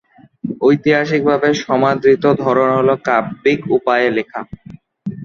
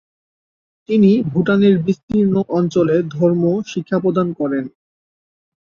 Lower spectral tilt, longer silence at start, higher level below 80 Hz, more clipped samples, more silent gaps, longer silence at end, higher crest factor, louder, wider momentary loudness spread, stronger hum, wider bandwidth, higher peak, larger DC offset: second, -6.5 dB/octave vs -8.5 dB/octave; second, 0.45 s vs 0.9 s; about the same, -54 dBFS vs -54 dBFS; neither; second, none vs 2.03-2.08 s; second, 0 s vs 0.95 s; about the same, 14 dB vs 16 dB; about the same, -15 LUFS vs -17 LUFS; first, 15 LU vs 8 LU; neither; about the same, 7 kHz vs 7 kHz; about the same, -2 dBFS vs -2 dBFS; neither